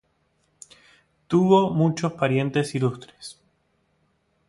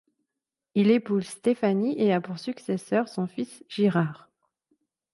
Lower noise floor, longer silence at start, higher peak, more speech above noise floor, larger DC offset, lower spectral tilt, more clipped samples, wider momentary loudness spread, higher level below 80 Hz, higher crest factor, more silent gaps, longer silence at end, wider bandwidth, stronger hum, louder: second, -68 dBFS vs -87 dBFS; first, 1.3 s vs 0.75 s; first, -6 dBFS vs -10 dBFS; second, 47 dB vs 62 dB; neither; about the same, -7 dB/octave vs -7 dB/octave; neither; first, 22 LU vs 11 LU; first, -62 dBFS vs -74 dBFS; about the same, 20 dB vs 16 dB; neither; first, 1.15 s vs 1 s; about the same, 11.5 kHz vs 11.5 kHz; neither; first, -22 LUFS vs -26 LUFS